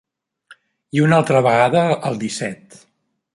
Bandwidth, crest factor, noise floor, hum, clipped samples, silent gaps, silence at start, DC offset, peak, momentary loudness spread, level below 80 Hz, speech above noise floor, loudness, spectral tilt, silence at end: 11.5 kHz; 18 dB; -50 dBFS; none; under 0.1%; none; 0.5 s; under 0.1%; -2 dBFS; 12 LU; -60 dBFS; 34 dB; -17 LUFS; -6 dB/octave; 0.8 s